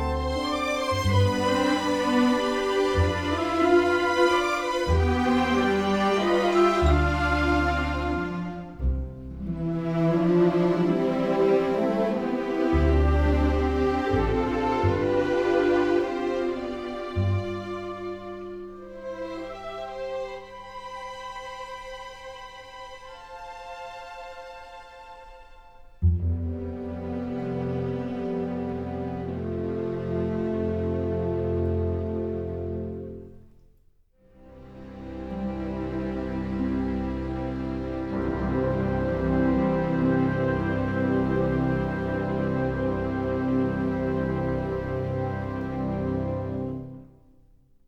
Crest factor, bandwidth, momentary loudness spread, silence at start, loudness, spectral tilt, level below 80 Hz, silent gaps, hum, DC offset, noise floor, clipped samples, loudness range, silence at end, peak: 18 dB; 13.5 kHz; 17 LU; 0 s; -26 LUFS; -7 dB/octave; -36 dBFS; none; none; under 0.1%; -60 dBFS; under 0.1%; 14 LU; 0.8 s; -8 dBFS